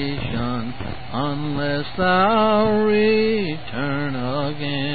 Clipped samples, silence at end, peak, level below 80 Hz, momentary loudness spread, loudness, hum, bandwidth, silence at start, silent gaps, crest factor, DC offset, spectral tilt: under 0.1%; 0 s; -4 dBFS; -42 dBFS; 10 LU; -21 LUFS; none; 4.8 kHz; 0 s; none; 16 dB; 3%; -11 dB/octave